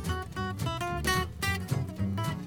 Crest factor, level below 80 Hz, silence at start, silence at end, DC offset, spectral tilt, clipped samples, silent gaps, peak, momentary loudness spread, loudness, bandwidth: 16 dB; -44 dBFS; 0 s; 0 s; under 0.1%; -5 dB/octave; under 0.1%; none; -16 dBFS; 5 LU; -32 LUFS; 19 kHz